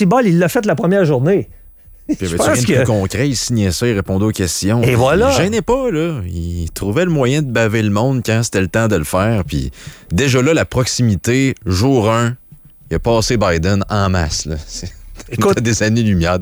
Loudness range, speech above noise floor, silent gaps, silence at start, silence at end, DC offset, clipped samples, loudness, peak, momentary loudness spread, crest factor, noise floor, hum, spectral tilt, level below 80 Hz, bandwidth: 2 LU; 27 dB; none; 0 s; 0 s; under 0.1%; under 0.1%; -15 LUFS; -2 dBFS; 10 LU; 12 dB; -41 dBFS; none; -5.5 dB/octave; -34 dBFS; over 20 kHz